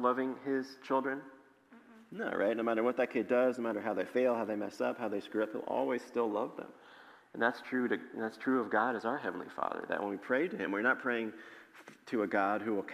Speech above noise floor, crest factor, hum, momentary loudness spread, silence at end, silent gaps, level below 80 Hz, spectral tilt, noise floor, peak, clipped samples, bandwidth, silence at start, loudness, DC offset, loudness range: 26 dB; 20 dB; none; 10 LU; 0 s; none; -86 dBFS; -6 dB/octave; -60 dBFS; -16 dBFS; under 0.1%; 15 kHz; 0 s; -34 LUFS; under 0.1%; 3 LU